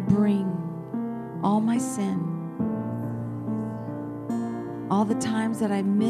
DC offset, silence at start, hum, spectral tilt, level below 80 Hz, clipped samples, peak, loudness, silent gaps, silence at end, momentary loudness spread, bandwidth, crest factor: under 0.1%; 0 s; none; -7 dB/octave; -60 dBFS; under 0.1%; -8 dBFS; -27 LUFS; none; 0 s; 9 LU; 13.5 kHz; 18 dB